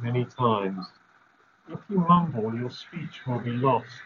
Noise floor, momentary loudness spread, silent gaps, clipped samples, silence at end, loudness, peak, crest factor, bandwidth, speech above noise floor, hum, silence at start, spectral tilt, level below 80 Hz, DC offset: -61 dBFS; 17 LU; none; under 0.1%; 0 s; -26 LUFS; -6 dBFS; 20 dB; 6.8 kHz; 35 dB; none; 0 s; -6.5 dB/octave; -64 dBFS; under 0.1%